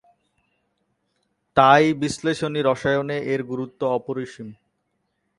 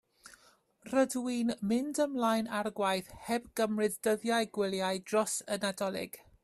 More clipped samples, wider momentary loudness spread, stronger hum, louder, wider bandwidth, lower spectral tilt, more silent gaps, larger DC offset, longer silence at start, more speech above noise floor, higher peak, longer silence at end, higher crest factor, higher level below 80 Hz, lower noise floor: neither; first, 16 LU vs 6 LU; neither; first, -21 LUFS vs -32 LUFS; second, 11.5 kHz vs 14.5 kHz; first, -5.5 dB/octave vs -4 dB/octave; neither; neither; first, 1.55 s vs 0.25 s; first, 53 dB vs 33 dB; first, 0 dBFS vs -16 dBFS; first, 0.85 s vs 0.25 s; first, 24 dB vs 16 dB; first, -58 dBFS vs -70 dBFS; first, -73 dBFS vs -65 dBFS